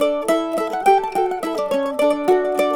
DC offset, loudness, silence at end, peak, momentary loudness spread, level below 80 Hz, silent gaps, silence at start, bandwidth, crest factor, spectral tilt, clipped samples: under 0.1%; -19 LUFS; 0 s; -4 dBFS; 5 LU; -56 dBFS; none; 0 s; 19 kHz; 16 dB; -4 dB/octave; under 0.1%